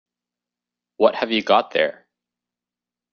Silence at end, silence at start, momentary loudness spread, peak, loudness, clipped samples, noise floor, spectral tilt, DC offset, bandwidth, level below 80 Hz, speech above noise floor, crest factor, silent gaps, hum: 1.2 s; 1 s; 5 LU; -2 dBFS; -20 LUFS; under 0.1%; -89 dBFS; -5 dB/octave; under 0.1%; 6.8 kHz; -68 dBFS; 70 dB; 22 dB; none; 60 Hz at -55 dBFS